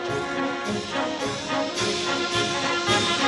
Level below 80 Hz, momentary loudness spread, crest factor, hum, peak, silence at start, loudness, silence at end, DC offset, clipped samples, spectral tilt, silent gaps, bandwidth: -54 dBFS; 6 LU; 16 dB; none; -8 dBFS; 0 s; -25 LUFS; 0 s; under 0.1%; under 0.1%; -3 dB/octave; none; 12 kHz